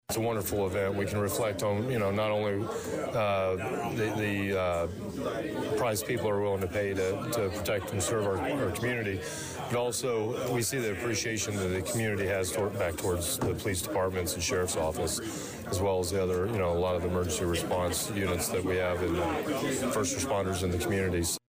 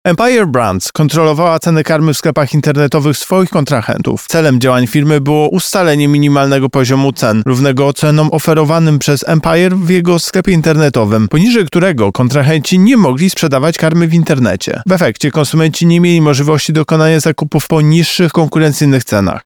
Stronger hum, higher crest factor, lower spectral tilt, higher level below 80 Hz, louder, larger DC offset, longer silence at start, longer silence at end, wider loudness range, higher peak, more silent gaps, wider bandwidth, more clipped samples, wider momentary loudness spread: neither; about the same, 10 dB vs 10 dB; second, -4.5 dB/octave vs -6 dB/octave; second, -52 dBFS vs -42 dBFS; second, -30 LUFS vs -10 LUFS; second, under 0.1% vs 0.3%; about the same, 0.1 s vs 0.05 s; about the same, 0.1 s vs 0.05 s; about the same, 1 LU vs 1 LU; second, -20 dBFS vs 0 dBFS; neither; second, 16 kHz vs 19 kHz; neither; about the same, 3 LU vs 3 LU